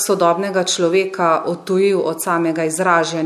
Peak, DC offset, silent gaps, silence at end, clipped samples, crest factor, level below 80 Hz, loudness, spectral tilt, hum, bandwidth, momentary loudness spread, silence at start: -2 dBFS; under 0.1%; none; 0 s; under 0.1%; 16 dB; -68 dBFS; -17 LUFS; -4 dB/octave; none; 15 kHz; 3 LU; 0 s